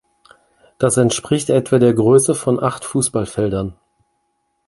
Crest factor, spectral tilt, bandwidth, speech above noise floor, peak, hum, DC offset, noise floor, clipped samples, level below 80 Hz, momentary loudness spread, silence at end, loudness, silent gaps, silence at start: 16 dB; -5.5 dB/octave; 11.5 kHz; 53 dB; -2 dBFS; none; under 0.1%; -69 dBFS; under 0.1%; -46 dBFS; 7 LU; 0.95 s; -16 LUFS; none; 0.8 s